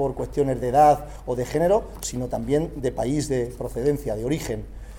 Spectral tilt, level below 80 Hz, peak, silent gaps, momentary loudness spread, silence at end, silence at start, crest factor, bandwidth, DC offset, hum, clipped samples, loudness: -6 dB/octave; -38 dBFS; -6 dBFS; none; 12 LU; 0 s; 0 s; 18 dB; 18 kHz; under 0.1%; none; under 0.1%; -24 LUFS